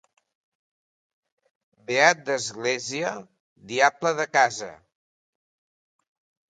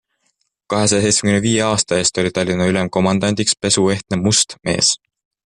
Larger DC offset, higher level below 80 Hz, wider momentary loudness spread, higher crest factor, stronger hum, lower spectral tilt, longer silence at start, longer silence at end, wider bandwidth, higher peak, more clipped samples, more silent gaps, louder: neither; second, -76 dBFS vs -50 dBFS; first, 13 LU vs 4 LU; first, 24 dB vs 16 dB; neither; about the same, -2.5 dB/octave vs -3.5 dB/octave; first, 1.9 s vs 0.7 s; first, 1.75 s vs 0.6 s; second, 9.4 kHz vs 11.5 kHz; about the same, -2 dBFS vs -2 dBFS; neither; first, 3.40-3.56 s vs none; second, -23 LUFS vs -16 LUFS